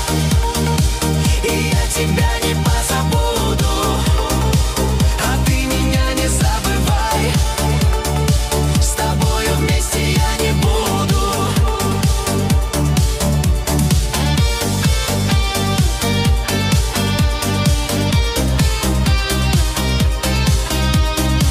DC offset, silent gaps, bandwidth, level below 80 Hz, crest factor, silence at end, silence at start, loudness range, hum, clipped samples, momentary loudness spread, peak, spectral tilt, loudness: under 0.1%; none; 16 kHz; -20 dBFS; 10 dB; 0 s; 0 s; 0 LU; none; under 0.1%; 1 LU; -4 dBFS; -4.5 dB/octave; -16 LUFS